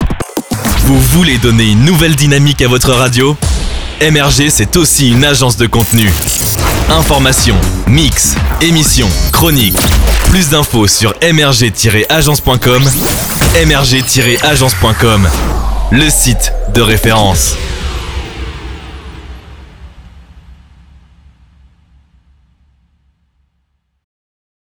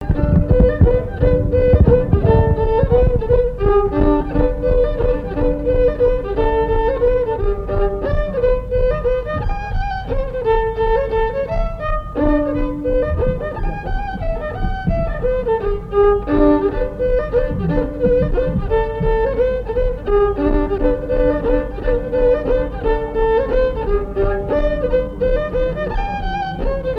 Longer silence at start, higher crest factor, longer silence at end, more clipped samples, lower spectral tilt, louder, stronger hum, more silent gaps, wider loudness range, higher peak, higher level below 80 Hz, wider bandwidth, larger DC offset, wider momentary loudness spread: about the same, 0 s vs 0 s; second, 10 dB vs 16 dB; first, 4.1 s vs 0 s; first, 0.2% vs under 0.1%; second, -4 dB/octave vs -10 dB/octave; first, -8 LUFS vs -18 LUFS; neither; neither; about the same, 5 LU vs 5 LU; about the same, 0 dBFS vs 0 dBFS; about the same, -18 dBFS vs -22 dBFS; first, over 20 kHz vs 5.2 kHz; neither; about the same, 9 LU vs 8 LU